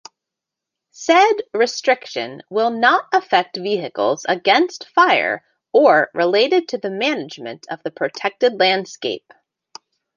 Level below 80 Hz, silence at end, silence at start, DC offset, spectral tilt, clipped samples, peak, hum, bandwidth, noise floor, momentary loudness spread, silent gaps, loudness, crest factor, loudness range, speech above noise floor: -74 dBFS; 1 s; 1 s; under 0.1%; -3.5 dB/octave; under 0.1%; -2 dBFS; none; 7.4 kHz; -84 dBFS; 13 LU; none; -18 LUFS; 18 dB; 4 LU; 66 dB